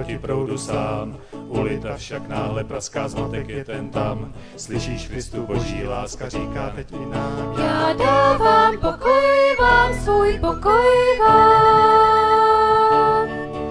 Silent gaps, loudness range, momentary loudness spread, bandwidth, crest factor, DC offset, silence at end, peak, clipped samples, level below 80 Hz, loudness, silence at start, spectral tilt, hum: none; 13 LU; 16 LU; 11 kHz; 16 dB; under 0.1%; 0 s; -2 dBFS; under 0.1%; -36 dBFS; -18 LUFS; 0 s; -5.5 dB/octave; none